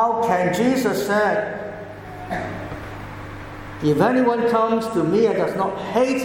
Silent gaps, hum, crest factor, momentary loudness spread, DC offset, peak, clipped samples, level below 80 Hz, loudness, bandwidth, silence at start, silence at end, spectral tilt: none; none; 16 dB; 16 LU; under 0.1%; -4 dBFS; under 0.1%; -48 dBFS; -20 LUFS; 17 kHz; 0 s; 0 s; -6 dB/octave